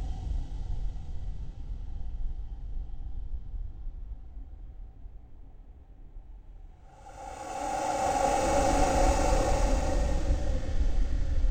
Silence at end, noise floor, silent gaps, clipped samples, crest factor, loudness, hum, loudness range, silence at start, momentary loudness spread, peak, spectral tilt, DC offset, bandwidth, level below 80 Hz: 0 s; -49 dBFS; none; under 0.1%; 16 dB; -31 LUFS; none; 20 LU; 0 s; 24 LU; -12 dBFS; -5 dB/octave; under 0.1%; 16 kHz; -32 dBFS